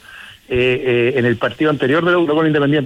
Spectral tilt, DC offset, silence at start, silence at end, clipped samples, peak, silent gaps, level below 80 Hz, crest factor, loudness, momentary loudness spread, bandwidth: -7.5 dB/octave; under 0.1%; 0.1 s; 0 s; under 0.1%; -4 dBFS; none; -46 dBFS; 10 dB; -16 LUFS; 3 LU; 11.5 kHz